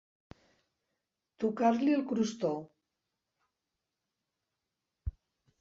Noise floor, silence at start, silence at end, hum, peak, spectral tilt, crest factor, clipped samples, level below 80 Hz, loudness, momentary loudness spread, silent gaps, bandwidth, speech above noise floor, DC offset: -88 dBFS; 1.4 s; 0.5 s; none; -14 dBFS; -6.5 dB/octave; 22 dB; under 0.1%; -54 dBFS; -31 LUFS; 17 LU; none; 7.8 kHz; 58 dB; under 0.1%